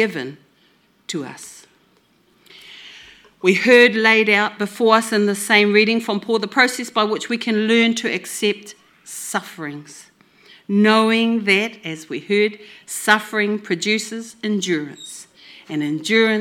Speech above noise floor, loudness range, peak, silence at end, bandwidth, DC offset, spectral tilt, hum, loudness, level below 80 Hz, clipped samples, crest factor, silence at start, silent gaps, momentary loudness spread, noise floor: 40 dB; 7 LU; 0 dBFS; 0 s; 17 kHz; under 0.1%; -3.5 dB/octave; none; -17 LUFS; -74 dBFS; under 0.1%; 20 dB; 0 s; none; 20 LU; -58 dBFS